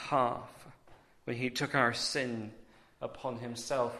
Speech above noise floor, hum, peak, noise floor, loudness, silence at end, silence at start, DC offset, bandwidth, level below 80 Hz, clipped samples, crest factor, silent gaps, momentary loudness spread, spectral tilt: 26 dB; none; -12 dBFS; -60 dBFS; -34 LUFS; 0 s; 0 s; under 0.1%; 13.5 kHz; -68 dBFS; under 0.1%; 24 dB; none; 16 LU; -4 dB/octave